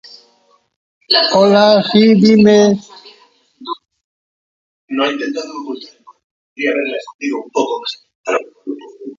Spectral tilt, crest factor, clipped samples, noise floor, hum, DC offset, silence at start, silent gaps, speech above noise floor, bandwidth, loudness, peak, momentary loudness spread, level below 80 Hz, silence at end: -5.5 dB/octave; 16 dB; under 0.1%; -56 dBFS; none; under 0.1%; 1.1 s; 4.04-4.88 s, 6.24-6.56 s, 7.14-7.19 s, 8.15-8.24 s; 43 dB; 7.6 kHz; -13 LUFS; 0 dBFS; 20 LU; -58 dBFS; 0.05 s